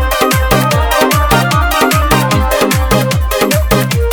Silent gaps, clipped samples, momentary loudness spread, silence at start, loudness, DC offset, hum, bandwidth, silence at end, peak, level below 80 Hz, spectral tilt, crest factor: none; under 0.1%; 2 LU; 0 s; -11 LUFS; under 0.1%; none; over 20 kHz; 0 s; 0 dBFS; -18 dBFS; -4.5 dB/octave; 10 dB